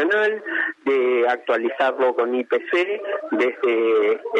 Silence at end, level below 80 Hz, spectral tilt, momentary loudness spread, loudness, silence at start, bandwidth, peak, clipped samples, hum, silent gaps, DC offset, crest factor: 0 s; -84 dBFS; -4.5 dB/octave; 5 LU; -21 LUFS; 0 s; 8.2 kHz; -8 dBFS; under 0.1%; none; none; under 0.1%; 12 dB